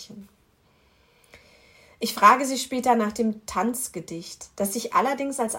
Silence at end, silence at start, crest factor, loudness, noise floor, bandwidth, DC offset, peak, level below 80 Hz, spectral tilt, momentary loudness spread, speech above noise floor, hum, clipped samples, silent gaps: 0 s; 0 s; 22 dB; -23 LUFS; -62 dBFS; 16.5 kHz; under 0.1%; -4 dBFS; -62 dBFS; -3.5 dB/octave; 19 LU; 38 dB; none; under 0.1%; none